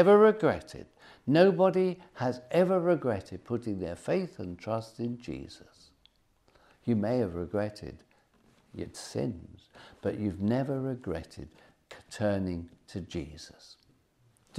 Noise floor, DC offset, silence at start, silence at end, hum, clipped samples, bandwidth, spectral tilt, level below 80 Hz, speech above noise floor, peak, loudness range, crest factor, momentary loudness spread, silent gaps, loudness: -67 dBFS; under 0.1%; 0 s; 0 s; none; under 0.1%; 12.5 kHz; -7 dB/octave; -62 dBFS; 38 dB; -10 dBFS; 9 LU; 20 dB; 23 LU; none; -30 LUFS